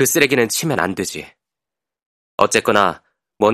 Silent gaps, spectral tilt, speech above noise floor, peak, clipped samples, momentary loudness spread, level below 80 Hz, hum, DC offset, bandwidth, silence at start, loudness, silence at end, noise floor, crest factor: 2.06-2.38 s; -3.5 dB/octave; 69 dB; 0 dBFS; under 0.1%; 16 LU; -56 dBFS; none; under 0.1%; 16 kHz; 0 s; -17 LUFS; 0 s; -86 dBFS; 18 dB